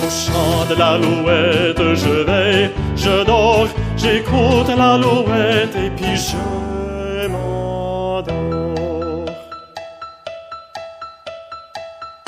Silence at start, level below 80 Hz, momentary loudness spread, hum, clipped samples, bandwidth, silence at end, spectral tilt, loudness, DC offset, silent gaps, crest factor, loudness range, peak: 0 s; -32 dBFS; 19 LU; none; under 0.1%; 15.5 kHz; 0.1 s; -5 dB/octave; -16 LUFS; under 0.1%; none; 16 dB; 11 LU; -2 dBFS